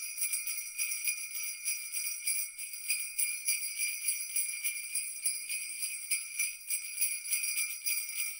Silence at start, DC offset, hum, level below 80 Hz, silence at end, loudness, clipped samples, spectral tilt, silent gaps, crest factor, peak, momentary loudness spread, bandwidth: 0 s; under 0.1%; none; -78 dBFS; 0 s; -32 LUFS; under 0.1%; 6.5 dB/octave; none; 20 dB; -16 dBFS; 4 LU; 16.5 kHz